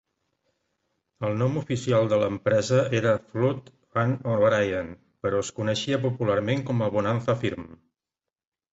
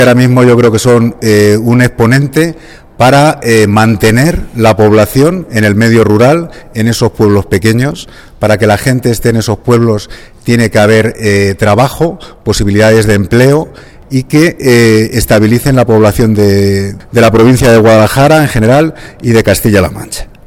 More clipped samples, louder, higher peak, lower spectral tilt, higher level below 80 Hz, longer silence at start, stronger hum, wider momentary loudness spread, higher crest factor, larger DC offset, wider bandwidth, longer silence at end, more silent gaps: second, under 0.1% vs 0.7%; second, -25 LUFS vs -8 LUFS; second, -10 dBFS vs 0 dBFS; about the same, -6 dB/octave vs -6 dB/octave; second, -56 dBFS vs -28 dBFS; first, 1.2 s vs 0 s; neither; about the same, 9 LU vs 9 LU; first, 16 dB vs 8 dB; neither; second, 8 kHz vs 17.5 kHz; first, 1 s vs 0.25 s; neither